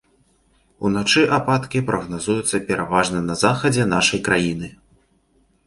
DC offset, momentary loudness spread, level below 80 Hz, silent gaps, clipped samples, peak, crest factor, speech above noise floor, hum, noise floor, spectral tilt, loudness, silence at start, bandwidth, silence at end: under 0.1%; 8 LU; -48 dBFS; none; under 0.1%; -2 dBFS; 18 dB; 42 dB; none; -61 dBFS; -4.5 dB/octave; -19 LUFS; 0.8 s; 11.5 kHz; 0.95 s